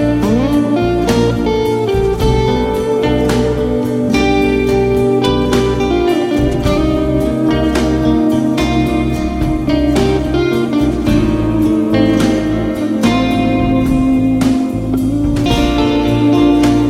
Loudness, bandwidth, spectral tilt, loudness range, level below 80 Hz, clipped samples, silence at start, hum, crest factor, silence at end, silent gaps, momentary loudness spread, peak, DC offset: -13 LUFS; 15.5 kHz; -6.5 dB/octave; 1 LU; -24 dBFS; under 0.1%; 0 s; none; 12 dB; 0 s; none; 3 LU; 0 dBFS; under 0.1%